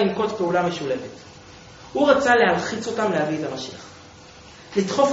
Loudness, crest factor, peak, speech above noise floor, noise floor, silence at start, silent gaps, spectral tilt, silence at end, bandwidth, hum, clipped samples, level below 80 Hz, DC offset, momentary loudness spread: -22 LUFS; 20 dB; -4 dBFS; 23 dB; -45 dBFS; 0 s; none; -3.5 dB/octave; 0 s; 8 kHz; none; under 0.1%; -56 dBFS; under 0.1%; 23 LU